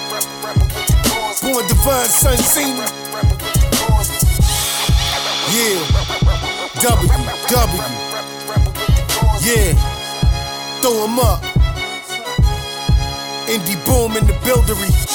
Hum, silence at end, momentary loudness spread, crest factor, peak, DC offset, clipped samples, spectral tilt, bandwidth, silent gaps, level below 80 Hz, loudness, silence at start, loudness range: none; 0 s; 8 LU; 16 dB; 0 dBFS; under 0.1%; under 0.1%; -4 dB/octave; 19.5 kHz; none; -20 dBFS; -16 LUFS; 0 s; 3 LU